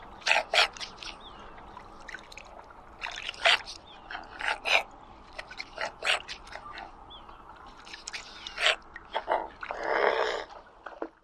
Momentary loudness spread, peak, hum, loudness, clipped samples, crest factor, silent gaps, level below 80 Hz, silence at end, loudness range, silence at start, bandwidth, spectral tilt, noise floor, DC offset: 23 LU; -4 dBFS; none; -29 LUFS; under 0.1%; 28 dB; none; -58 dBFS; 0.15 s; 6 LU; 0 s; 15.5 kHz; -0.5 dB/octave; -50 dBFS; under 0.1%